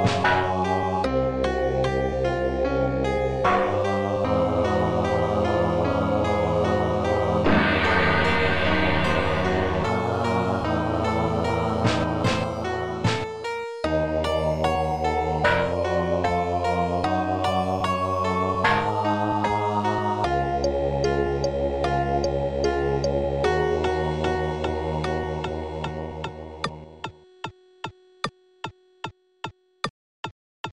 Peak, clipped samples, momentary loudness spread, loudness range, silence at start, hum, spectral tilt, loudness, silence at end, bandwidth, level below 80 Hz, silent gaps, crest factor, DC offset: -8 dBFS; under 0.1%; 13 LU; 10 LU; 0 s; none; -6.5 dB/octave; -24 LUFS; 0 s; 12 kHz; -38 dBFS; 29.90-30.23 s, 30.31-30.64 s; 16 dB; under 0.1%